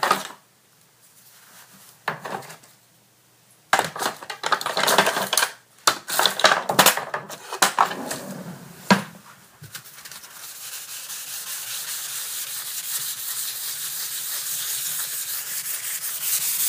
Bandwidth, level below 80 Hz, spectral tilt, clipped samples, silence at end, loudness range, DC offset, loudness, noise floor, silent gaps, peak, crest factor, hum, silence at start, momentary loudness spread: 16 kHz; -72 dBFS; -1 dB/octave; under 0.1%; 0 s; 11 LU; under 0.1%; -23 LUFS; -57 dBFS; none; 0 dBFS; 26 dB; none; 0 s; 19 LU